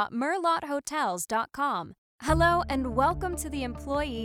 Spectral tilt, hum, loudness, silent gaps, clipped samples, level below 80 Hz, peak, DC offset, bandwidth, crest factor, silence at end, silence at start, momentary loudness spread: -4.5 dB/octave; none; -28 LUFS; 1.98-2.19 s; under 0.1%; -42 dBFS; -12 dBFS; under 0.1%; 18 kHz; 16 dB; 0 s; 0 s; 10 LU